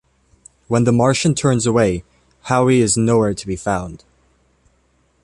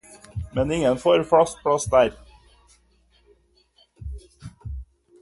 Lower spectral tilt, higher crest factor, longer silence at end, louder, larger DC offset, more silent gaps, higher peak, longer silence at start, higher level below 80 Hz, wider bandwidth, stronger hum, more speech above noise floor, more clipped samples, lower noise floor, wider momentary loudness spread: about the same, -5.5 dB/octave vs -5 dB/octave; second, 16 dB vs 22 dB; first, 1.25 s vs 0.4 s; first, -17 LUFS vs -21 LUFS; neither; neither; about the same, -2 dBFS vs -4 dBFS; first, 0.7 s vs 0.1 s; about the same, -44 dBFS vs -42 dBFS; about the same, 11.5 kHz vs 11.5 kHz; neither; about the same, 44 dB vs 41 dB; neither; about the same, -60 dBFS vs -61 dBFS; second, 10 LU vs 21 LU